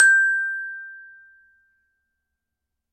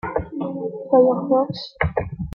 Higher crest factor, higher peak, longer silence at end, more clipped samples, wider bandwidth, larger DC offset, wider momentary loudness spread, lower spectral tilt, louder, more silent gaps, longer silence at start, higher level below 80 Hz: about the same, 22 dB vs 18 dB; about the same, -2 dBFS vs -4 dBFS; first, 1.9 s vs 0 s; neither; first, 14 kHz vs 6 kHz; neither; first, 24 LU vs 11 LU; second, 4.5 dB/octave vs -8.5 dB/octave; about the same, -20 LUFS vs -21 LUFS; neither; about the same, 0 s vs 0.05 s; second, -82 dBFS vs -42 dBFS